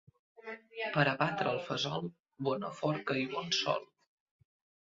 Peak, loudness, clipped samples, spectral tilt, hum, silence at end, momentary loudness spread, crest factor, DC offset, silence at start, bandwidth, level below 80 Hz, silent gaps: -12 dBFS; -34 LUFS; under 0.1%; -3 dB/octave; none; 1 s; 15 LU; 24 dB; under 0.1%; 0.45 s; 7.6 kHz; -76 dBFS; 2.20-2.25 s